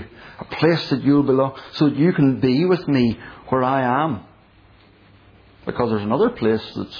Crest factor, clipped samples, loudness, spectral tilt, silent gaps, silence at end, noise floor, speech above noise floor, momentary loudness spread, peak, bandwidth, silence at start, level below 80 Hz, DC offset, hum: 16 dB; under 0.1%; -19 LUFS; -8.5 dB/octave; none; 0 s; -51 dBFS; 32 dB; 15 LU; -4 dBFS; 5.4 kHz; 0 s; -52 dBFS; under 0.1%; none